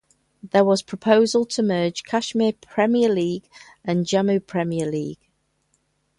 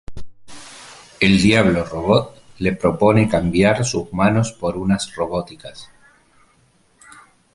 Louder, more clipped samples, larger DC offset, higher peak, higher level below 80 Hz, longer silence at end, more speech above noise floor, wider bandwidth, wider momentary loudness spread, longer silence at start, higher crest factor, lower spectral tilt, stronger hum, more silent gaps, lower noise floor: second, -21 LUFS vs -18 LUFS; neither; neither; second, -4 dBFS vs 0 dBFS; second, -64 dBFS vs -42 dBFS; second, 1.05 s vs 1.7 s; first, 48 dB vs 40 dB; about the same, 11.5 kHz vs 11.5 kHz; second, 9 LU vs 22 LU; first, 0.45 s vs 0.1 s; about the same, 18 dB vs 18 dB; about the same, -5.5 dB/octave vs -5.5 dB/octave; neither; neither; first, -68 dBFS vs -57 dBFS